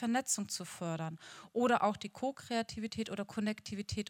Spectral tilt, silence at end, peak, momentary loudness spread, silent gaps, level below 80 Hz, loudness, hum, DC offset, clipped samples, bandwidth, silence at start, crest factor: -4 dB/octave; 0.05 s; -18 dBFS; 10 LU; none; -66 dBFS; -36 LUFS; none; under 0.1%; under 0.1%; 17 kHz; 0 s; 20 dB